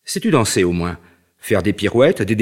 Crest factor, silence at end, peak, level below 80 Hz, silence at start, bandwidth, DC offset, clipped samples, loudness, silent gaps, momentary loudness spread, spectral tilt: 16 dB; 0 s; -2 dBFS; -44 dBFS; 0.05 s; 16.5 kHz; under 0.1%; under 0.1%; -17 LUFS; none; 12 LU; -5 dB/octave